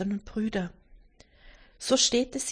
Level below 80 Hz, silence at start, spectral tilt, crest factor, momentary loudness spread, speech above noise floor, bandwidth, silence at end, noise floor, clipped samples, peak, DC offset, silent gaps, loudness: -52 dBFS; 0 s; -3 dB/octave; 20 dB; 14 LU; 29 dB; 10.5 kHz; 0 s; -57 dBFS; under 0.1%; -10 dBFS; under 0.1%; none; -27 LUFS